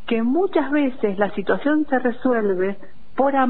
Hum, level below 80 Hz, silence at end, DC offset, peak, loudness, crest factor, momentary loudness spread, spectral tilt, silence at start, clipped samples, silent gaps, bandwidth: none; -54 dBFS; 0 s; 4%; -6 dBFS; -21 LUFS; 14 dB; 4 LU; -10.5 dB/octave; 0.1 s; under 0.1%; none; 4.3 kHz